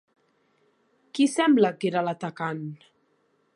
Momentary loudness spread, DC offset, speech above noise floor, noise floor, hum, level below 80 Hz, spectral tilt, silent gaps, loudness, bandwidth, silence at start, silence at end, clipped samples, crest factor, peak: 16 LU; under 0.1%; 45 dB; -69 dBFS; none; -82 dBFS; -5.5 dB/octave; none; -25 LUFS; 11.5 kHz; 1.15 s; 0.8 s; under 0.1%; 20 dB; -8 dBFS